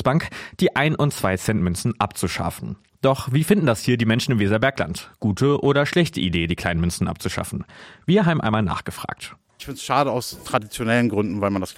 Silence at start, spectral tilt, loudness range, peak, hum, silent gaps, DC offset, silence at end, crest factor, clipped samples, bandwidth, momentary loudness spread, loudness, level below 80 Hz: 0 s; -5.5 dB/octave; 3 LU; -4 dBFS; none; none; under 0.1%; 0.05 s; 18 dB; under 0.1%; 16.5 kHz; 13 LU; -21 LUFS; -44 dBFS